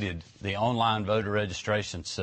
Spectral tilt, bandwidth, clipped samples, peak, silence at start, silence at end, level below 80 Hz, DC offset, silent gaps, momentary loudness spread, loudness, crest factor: -5 dB/octave; 8.8 kHz; under 0.1%; -12 dBFS; 0 s; 0 s; -54 dBFS; under 0.1%; none; 9 LU; -29 LUFS; 16 dB